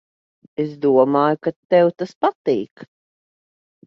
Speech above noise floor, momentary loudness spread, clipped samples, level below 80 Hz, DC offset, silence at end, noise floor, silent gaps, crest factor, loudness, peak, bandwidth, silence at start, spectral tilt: over 72 dB; 11 LU; under 0.1%; -68 dBFS; under 0.1%; 1.05 s; under -90 dBFS; 1.56-1.69 s, 2.15-2.21 s, 2.35-2.45 s, 2.71-2.76 s; 18 dB; -19 LUFS; -2 dBFS; 6.6 kHz; 0.6 s; -8 dB/octave